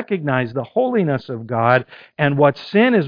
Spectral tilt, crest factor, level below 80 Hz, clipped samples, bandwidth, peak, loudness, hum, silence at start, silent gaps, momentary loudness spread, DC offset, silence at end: -9 dB/octave; 18 dB; -58 dBFS; under 0.1%; 5.2 kHz; 0 dBFS; -18 LUFS; none; 0 s; none; 8 LU; under 0.1%; 0 s